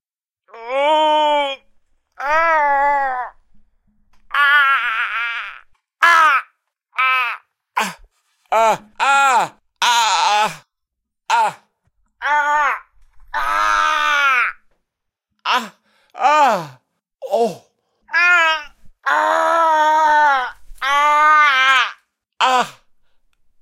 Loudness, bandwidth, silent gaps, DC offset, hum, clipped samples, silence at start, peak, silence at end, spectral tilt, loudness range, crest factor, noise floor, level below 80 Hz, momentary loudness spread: -16 LUFS; 16 kHz; none; under 0.1%; none; under 0.1%; 0.55 s; 0 dBFS; 0.9 s; -1 dB/octave; 5 LU; 18 dB; -78 dBFS; -52 dBFS; 14 LU